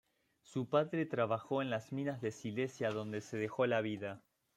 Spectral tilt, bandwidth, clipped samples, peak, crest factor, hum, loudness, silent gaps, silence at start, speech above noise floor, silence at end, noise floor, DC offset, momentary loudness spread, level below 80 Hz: -6.5 dB/octave; 13.5 kHz; under 0.1%; -18 dBFS; 20 dB; none; -38 LUFS; none; 0.5 s; 31 dB; 0.4 s; -68 dBFS; under 0.1%; 9 LU; -80 dBFS